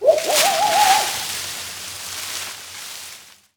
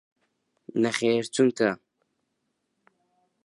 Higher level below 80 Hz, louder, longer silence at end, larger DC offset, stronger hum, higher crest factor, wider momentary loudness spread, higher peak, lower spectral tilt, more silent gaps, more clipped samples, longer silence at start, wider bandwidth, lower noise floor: first, -62 dBFS vs -74 dBFS; first, -19 LUFS vs -25 LUFS; second, 0.3 s vs 1.7 s; neither; neither; about the same, 18 dB vs 20 dB; first, 17 LU vs 9 LU; first, -2 dBFS vs -8 dBFS; second, 0 dB/octave vs -4.5 dB/octave; neither; neither; second, 0 s vs 0.75 s; first, over 20 kHz vs 11.5 kHz; second, -42 dBFS vs -78 dBFS